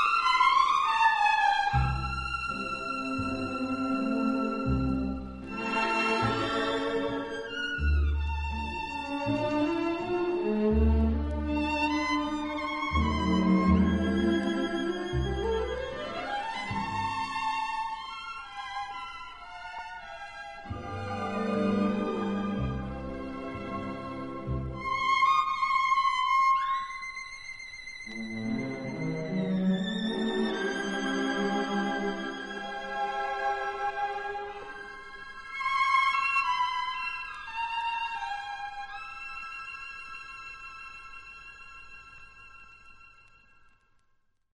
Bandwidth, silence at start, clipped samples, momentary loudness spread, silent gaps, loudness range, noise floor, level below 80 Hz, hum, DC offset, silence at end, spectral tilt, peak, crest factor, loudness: 11 kHz; 0 s; under 0.1%; 16 LU; none; 11 LU; -69 dBFS; -40 dBFS; none; under 0.1%; 1.45 s; -6 dB/octave; -12 dBFS; 18 dB; -29 LUFS